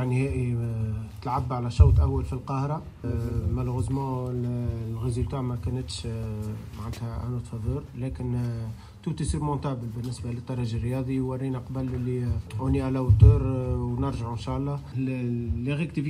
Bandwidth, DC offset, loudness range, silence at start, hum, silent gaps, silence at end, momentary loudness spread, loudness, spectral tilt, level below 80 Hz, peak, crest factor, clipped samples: 11 kHz; under 0.1%; 7 LU; 0 s; none; none; 0 s; 10 LU; -28 LUFS; -8 dB/octave; -34 dBFS; -4 dBFS; 22 dB; under 0.1%